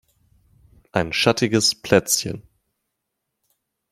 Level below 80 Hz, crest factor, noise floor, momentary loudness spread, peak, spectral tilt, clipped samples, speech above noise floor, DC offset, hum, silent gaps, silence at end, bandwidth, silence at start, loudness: -54 dBFS; 22 dB; -79 dBFS; 11 LU; -2 dBFS; -3.5 dB/octave; under 0.1%; 60 dB; under 0.1%; none; none; 1.5 s; 16 kHz; 0.95 s; -20 LUFS